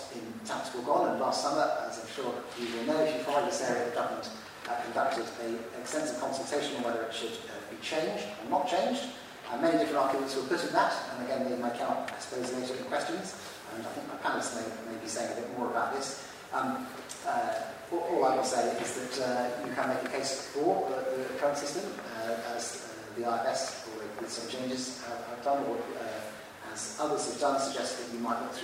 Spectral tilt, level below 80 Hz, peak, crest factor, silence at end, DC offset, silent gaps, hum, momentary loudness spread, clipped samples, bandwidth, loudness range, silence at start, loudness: -3 dB/octave; -74 dBFS; -12 dBFS; 22 dB; 0 s; under 0.1%; none; none; 10 LU; under 0.1%; 16 kHz; 4 LU; 0 s; -33 LUFS